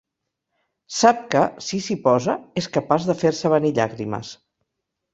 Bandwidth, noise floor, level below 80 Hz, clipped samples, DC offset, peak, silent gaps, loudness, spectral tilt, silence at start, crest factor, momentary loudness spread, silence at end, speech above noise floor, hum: 8 kHz; -80 dBFS; -60 dBFS; under 0.1%; under 0.1%; -2 dBFS; none; -21 LUFS; -5 dB/octave; 0.9 s; 20 dB; 12 LU; 0.8 s; 60 dB; none